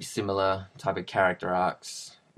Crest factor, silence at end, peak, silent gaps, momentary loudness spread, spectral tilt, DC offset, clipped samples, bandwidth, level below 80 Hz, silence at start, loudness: 20 dB; 0.25 s; -10 dBFS; none; 13 LU; -4.5 dB/octave; under 0.1%; under 0.1%; 14 kHz; -66 dBFS; 0 s; -28 LUFS